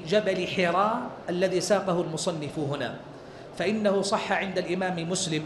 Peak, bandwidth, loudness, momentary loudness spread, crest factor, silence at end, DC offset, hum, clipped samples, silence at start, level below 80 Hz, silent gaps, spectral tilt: -10 dBFS; 12 kHz; -27 LUFS; 8 LU; 18 dB; 0 s; under 0.1%; none; under 0.1%; 0 s; -62 dBFS; none; -4.5 dB/octave